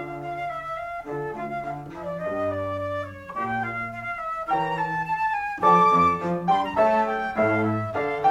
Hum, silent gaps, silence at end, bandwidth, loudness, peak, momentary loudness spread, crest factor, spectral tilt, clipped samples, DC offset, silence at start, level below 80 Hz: none; none; 0 s; 14 kHz; -25 LUFS; -6 dBFS; 13 LU; 18 dB; -7 dB/octave; under 0.1%; under 0.1%; 0 s; -56 dBFS